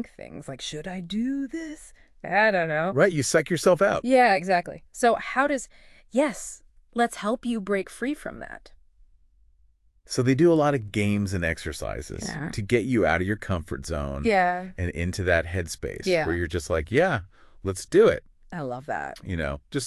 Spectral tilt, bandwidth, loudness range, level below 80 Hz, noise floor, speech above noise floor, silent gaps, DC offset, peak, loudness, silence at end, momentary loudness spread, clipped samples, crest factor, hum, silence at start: -5.5 dB/octave; 13.5 kHz; 7 LU; -44 dBFS; -61 dBFS; 36 dB; none; under 0.1%; -6 dBFS; -25 LUFS; 0 s; 15 LU; under 0.1%; 18 dB; none; 0 s